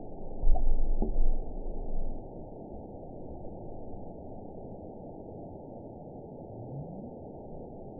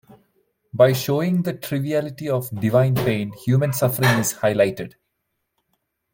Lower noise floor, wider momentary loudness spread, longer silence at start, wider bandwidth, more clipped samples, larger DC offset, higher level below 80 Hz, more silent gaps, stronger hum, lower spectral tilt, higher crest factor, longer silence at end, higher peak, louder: second, -45 dBFS vs -76 dBFS; first, 11 LU vs 8 LU; second, 0 s vs 0.75 s; second, 1 kHz vs 17 kHz; neither; neither; first, -32 dBFS vs -56 dBFS; neither; neither; first, -15 dB/octave vs -5.5 dB/octave; about the same, 20 dB vs 18 dB; second, 0 s vs 1.25 s; second, -10 dBFS vs -2 dBFS; second, -41 LUFS vs -20 LUFS